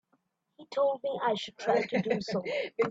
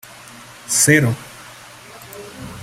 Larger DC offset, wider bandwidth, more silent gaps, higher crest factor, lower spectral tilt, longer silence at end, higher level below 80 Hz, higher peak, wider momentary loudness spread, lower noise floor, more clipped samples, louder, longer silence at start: neither; second, 8 kHz vs 16 kHz; neither; about the same, 18 dB vs 22 dB; first, -5.5 dB/octave vs -3.5 dB/octave; about the same, 0 s vs 0 s; second, -72 dBFS vs -54 dBFS; second, -14 dBFS vs 0 dBFS; second, 4 LU vs 25 LU; first, -75 dBFS vs -40 dBFS; neither; second, -31 LUFS vs -15 LUFS; about the same, 0.6 s vs 0.7 s